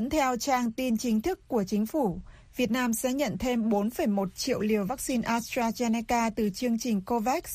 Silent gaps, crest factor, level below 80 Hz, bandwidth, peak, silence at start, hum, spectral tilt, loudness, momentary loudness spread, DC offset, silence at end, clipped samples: none; 14 dB; -52 dBFS; 15.5 kHz; -14 dBFS; 0 s; none; -4.5 dB/octave; -28 LUFS; 3 LU; under 0.1%; 0 s; under 0.1%